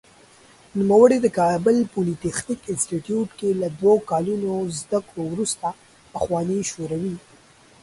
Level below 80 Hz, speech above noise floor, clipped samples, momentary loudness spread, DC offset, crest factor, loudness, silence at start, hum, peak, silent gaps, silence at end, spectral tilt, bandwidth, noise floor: -56 dBFS; 31 dB; under 0.1%; 12 LU; under 0.1%; 20 dB; -22 LUFS; 0.75 s; none; -2 dBFS; none; 0.65 s; -5.5 dB/octave; 11.5 kHz; -52 dBFS